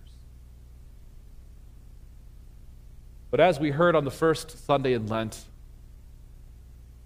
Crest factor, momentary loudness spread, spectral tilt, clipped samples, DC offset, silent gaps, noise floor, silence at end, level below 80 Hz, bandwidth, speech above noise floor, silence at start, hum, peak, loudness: 22 dB; 9 LU; -6 dB/octave; under 0.1%; under 0.1%; none; -48 dBFS; 0.15 s; -48 dBFS; 15.5 kHz; 23 dB; 0 s; 60 Hz at -50 dBFS; -6 dBFS; -25 LUFS